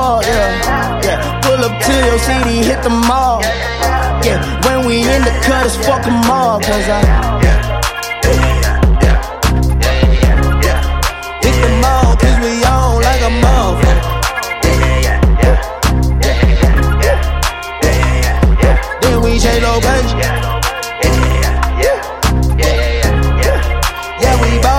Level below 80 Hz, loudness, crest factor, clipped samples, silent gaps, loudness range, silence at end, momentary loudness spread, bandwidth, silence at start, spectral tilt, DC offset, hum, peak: -14 dBFS; -12 LUFS; 10 dB; under 0.1%; none; 1 LU; 0 s; 4 LU; 16.5 kHz; 0 s; -5 dB/octave; under 0.1%; none; 0 dBFS